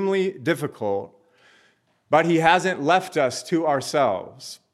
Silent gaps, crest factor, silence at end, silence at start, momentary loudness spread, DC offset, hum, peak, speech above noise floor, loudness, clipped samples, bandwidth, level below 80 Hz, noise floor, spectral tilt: none; 20 dB; 0.2 s; 0 s; 12 LU; under 0.1%; none; -2 dBFS; 41 dB; -22 LUFS; under 0.1%; 14 kHz; -68 dBFS; -63 dBFS; -5 dB/octave